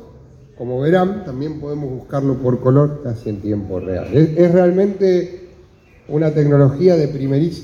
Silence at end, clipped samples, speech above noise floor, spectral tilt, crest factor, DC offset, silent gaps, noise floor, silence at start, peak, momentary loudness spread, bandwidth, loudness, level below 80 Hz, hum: 0 s; under 0.1%; 31 dB; -9.5 dB/octave; 16 dB; under 0.1%; none; -46 dBFS; 0 s; 0 dBFS; 13 LU; 7 kHz; -17 LUFS; -46 dBFS; none